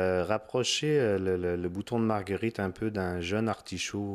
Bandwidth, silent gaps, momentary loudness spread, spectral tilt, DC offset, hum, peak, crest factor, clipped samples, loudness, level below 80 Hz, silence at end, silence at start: 14.5 kHz; none; 6 LU; -5 dB/octave; under 0.1%; none; -12 dBFS; 18 dB; under 0.1%; -30 LUFS; -58 dBFS; 0 s; 0 s